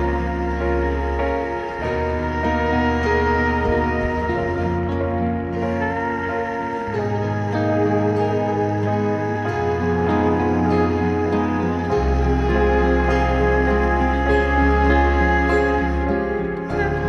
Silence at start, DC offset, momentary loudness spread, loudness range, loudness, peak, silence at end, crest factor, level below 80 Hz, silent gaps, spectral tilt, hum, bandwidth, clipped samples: 0 s; under 0.1%; 6 LU; 4 LU; -20 LUFS; -6 dBFS; 0 s; 14 dB; -26 dBFS; none; -8 dB/octave; none; 7 kHz; under 0.1%